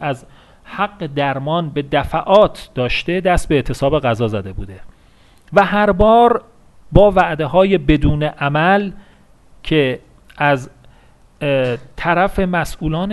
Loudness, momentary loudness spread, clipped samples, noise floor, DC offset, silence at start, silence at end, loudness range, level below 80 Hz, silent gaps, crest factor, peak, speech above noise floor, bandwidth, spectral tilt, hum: -16 LUFS; 11 LU; under 0.1%; -48 dBFS; under 0.1%; 0 s; 0 s; 5 LU; -32 dBFS; none; 16 dB; 0 dBFS; 33 dB; 12.5 kHz; -6.5 dB/octave; none